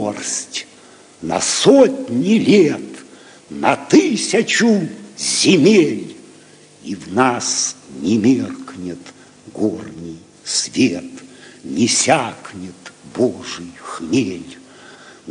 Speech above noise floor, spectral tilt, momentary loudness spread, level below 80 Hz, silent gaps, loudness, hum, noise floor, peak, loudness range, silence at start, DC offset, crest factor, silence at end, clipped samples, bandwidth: 29 dB; -3.5 dB/octave; 22 LU; -60 dBFS; none; -16 LUFS; none; -45 dBFS; 0 dBFS; 6 LU; 0 s; under 0.1%; 18 dB; 0 s; under 0.1%; 10.5 kHz